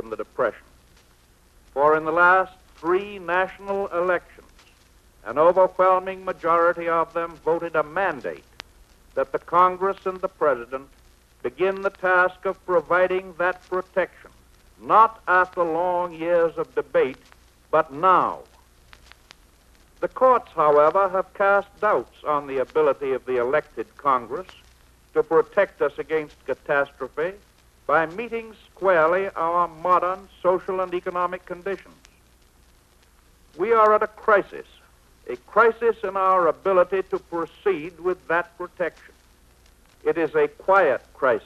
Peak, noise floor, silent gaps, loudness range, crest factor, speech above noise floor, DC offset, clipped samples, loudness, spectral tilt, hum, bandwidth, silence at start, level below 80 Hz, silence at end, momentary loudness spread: -4 dBFS; -56 dBFS; none; 4 LU; 20 dB; 34 dB; under 0.1%; under 0.1%; -22 LUFS; -6 dB/octave; none; 13 kHz; 0.05 s; -56 dBFS; 0.05 s; 13 LU